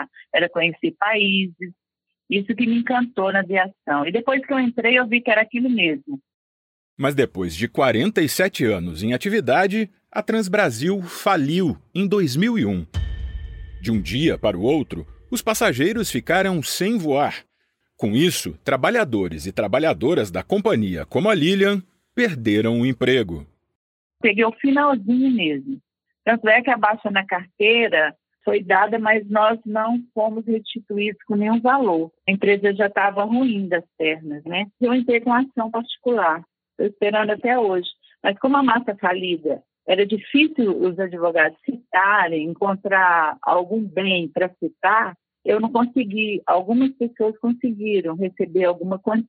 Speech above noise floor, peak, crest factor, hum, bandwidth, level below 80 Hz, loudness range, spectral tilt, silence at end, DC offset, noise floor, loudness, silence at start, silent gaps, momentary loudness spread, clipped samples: 51 dB; -4 dBFS; 16 dB; none; 16.5 kHz; -46 dBFS; 3 LU; -5 dB/octave; 0.05 s; under 0.1%; -71 dBFS; -20 LUFS; 0 s; 6.34-6.97 s, 23.75-24.10 s; 9 LU; under 0.1%